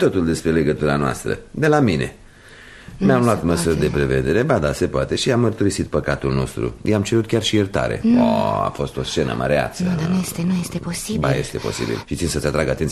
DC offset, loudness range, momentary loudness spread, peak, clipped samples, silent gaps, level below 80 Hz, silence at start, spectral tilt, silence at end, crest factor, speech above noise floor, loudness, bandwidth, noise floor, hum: under 0.1%; 3 LU; 8 LU; -2 dBFS; under 0.1%; none; -38 dBFS; 0 s; -5.5 dB/octave; 0 s; 18 dB; 24 dB; -20 LUFS; 13.5 kHz; -43 dBFS; none